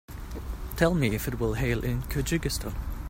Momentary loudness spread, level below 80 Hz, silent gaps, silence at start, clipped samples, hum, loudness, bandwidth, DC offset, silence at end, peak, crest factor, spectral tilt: 13 LU; -36 dBFS; none; 0.1 s; under 0.1%; none; -29 LUFS; 16.5 kHz; under 0.1%; 0 s; -8 dBFS; 22 dB; -5.5 dB/octave